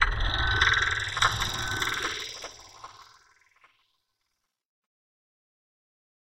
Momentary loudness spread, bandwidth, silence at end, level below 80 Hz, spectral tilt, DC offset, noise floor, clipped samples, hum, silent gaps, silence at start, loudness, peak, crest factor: 24 LU; 16.5 kHz; 3.35 s; -40 dBFS; -2 dB/octave; under 0.1%; -81 dBFS; under 0.1%; none; none; 0 s; -26 LUFS; -6 dBFS; 24 dB